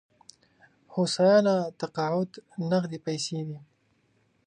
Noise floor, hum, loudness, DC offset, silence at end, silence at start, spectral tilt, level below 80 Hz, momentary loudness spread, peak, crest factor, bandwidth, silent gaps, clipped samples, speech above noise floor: -69 dBFS; none; -27 LUFS; under 0.1%; 0.85 s; 0.9 s; -5.5 dB/octave; -74 dBFS; 15 LU; -10 dBFS; 18 dB; 10 kHz; none; under 0.1%; 42 dB